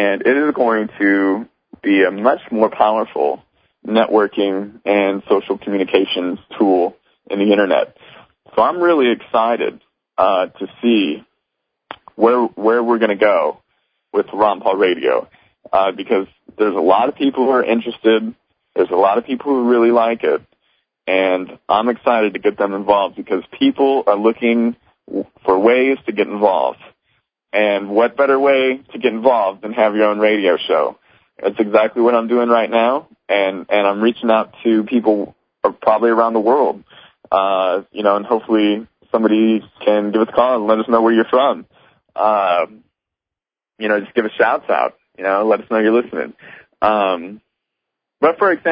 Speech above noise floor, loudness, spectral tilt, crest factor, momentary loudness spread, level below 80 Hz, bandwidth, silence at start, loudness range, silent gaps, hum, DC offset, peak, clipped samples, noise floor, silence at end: 72 dB; -16 LUFS; -10 dB/octave; 16 dB; 9 LU; -62 dBFS; 5.2 kHz; 0 s; 2 LU; none; none; under 0.1%; 0 dBFS; under 0.1%; -87 dBFS; 0 s